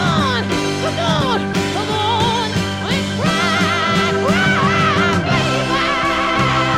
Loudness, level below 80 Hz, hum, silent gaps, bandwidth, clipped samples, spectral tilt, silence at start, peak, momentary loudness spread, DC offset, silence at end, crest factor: -16 LUFS; -40 dBFS; none; none; 15 kHz; under 0.1%; -4.5 dB/octave; 0 s; -2 dBFS; 5 LU; under 0.1%; 0 s; 14 dB